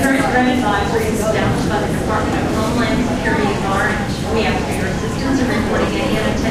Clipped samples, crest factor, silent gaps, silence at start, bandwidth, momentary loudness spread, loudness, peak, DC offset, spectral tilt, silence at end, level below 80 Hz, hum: under 0.1%; 14 dB; none; 0 s; 15.5 kHz; 4 LU; -17 LUFS; -2 dBFS; under 0.1%; -5.5 dB/octave; 0 s; -30 dBFS; none